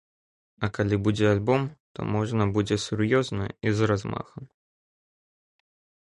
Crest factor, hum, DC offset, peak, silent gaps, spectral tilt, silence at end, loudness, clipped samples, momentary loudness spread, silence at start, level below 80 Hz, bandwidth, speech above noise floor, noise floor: 18 dB; none; under 0.1%; -10 dBFS; 1.80-1.95 s; -6.5 dB/octave; 1.55 s; -26 LUFS; under 0.1%; 12 LU; 0.6 s; -50 dBFS; 10.5 kHz; over 65 dB; under -90 dBFS